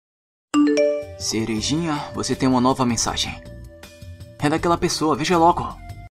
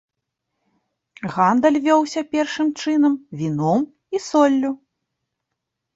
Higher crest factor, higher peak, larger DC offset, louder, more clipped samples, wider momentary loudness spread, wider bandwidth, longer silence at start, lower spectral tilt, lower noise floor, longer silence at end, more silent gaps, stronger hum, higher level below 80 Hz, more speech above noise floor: about the same, 18 dB vs 18 dB; about the same, -4 dBFS vs -4 dBFS; neither; about the same, -20 LUFS vs -19 LUFS; neither; first, 22 LU vs 11 LU; first, 14.5 kHz vs 8 kHz; second, 0.55 s vs 1.2 s; second, -4.5 dB/octave vs -6 dB/octave; second, -40 dBFS vs -80 dBFS; second, 0.05 s vs 1.2 s; neither; neither; first, -42 dBFS vs -64 dBFS; second, 20 dB vs 61 dB